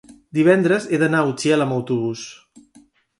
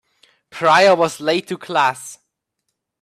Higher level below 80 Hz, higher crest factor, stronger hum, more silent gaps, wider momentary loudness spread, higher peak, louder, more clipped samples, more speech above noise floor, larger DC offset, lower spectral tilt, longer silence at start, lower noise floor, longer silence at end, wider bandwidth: about the same, -64 dBFS vs -66 dBFS; about the same, 18 dB vs 18 dB; neither; neither; second, 11 LU vs 21 LU; about the same, -2 dBFS vs -2 dBFS; second, -19 LUFS vs -16 LUFS; neither; second, 35 dB vs 60 dB; neither; first, -6 dB/octave vs -3.5 dB/octave; second, 0.35 s vs 0.55 s; second, -53 dBFS vs -76 dBFS; about the same, 0.85 s vs 0.9 s; second, 11.5 kHz vs 14 kHz